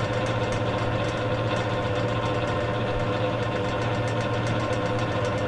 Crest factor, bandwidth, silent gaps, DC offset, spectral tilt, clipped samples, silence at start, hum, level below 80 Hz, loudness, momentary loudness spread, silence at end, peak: 12 dB; 11 kHz; none; under 0.1%; -6.5 dB/octave; under 0.1%; 0 s; none; -44 dBFS; -26 LUFS; 1 LU; 0 s; -12 dBFS